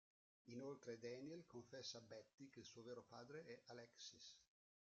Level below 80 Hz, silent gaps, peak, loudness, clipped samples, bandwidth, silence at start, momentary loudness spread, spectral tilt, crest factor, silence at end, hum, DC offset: under -90 dBFS; 2.34-2.38 s; -42 dBFS; -58 LUFS; under 0.1%; 7.6 kHz; 0.45 s; 7 LU; -4 dB/octave; 18 dB; 0.35 s; none; under 0.1%